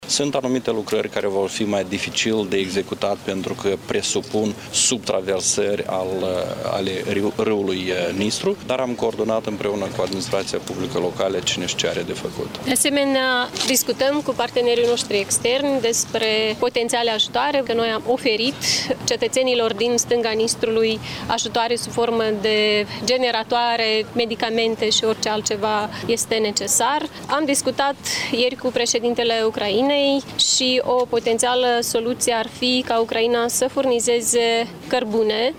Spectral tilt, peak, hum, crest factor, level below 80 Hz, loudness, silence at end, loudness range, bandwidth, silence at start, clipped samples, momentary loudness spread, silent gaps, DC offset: -2.5 dB/octave; -4 dBFS; none; 16 dB; -54 dBFS; -20 LUFS; 0 s; 4 LU; 18 kHz; 0 s; under 0.1%; 6 LU; none; under 0.1%